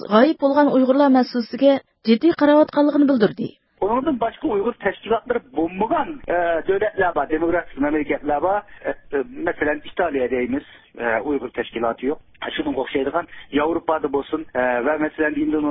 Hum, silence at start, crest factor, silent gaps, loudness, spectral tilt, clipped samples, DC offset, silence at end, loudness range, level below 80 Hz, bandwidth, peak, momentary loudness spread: none; 0 s; 18 dB; none; -20 LUFS; -10.5 dB/octave; under 0.1%; under 0.1%; 0 s; 7 LU; -50 dBFS; 5.8 kHz; -2 dBFS; 10 LU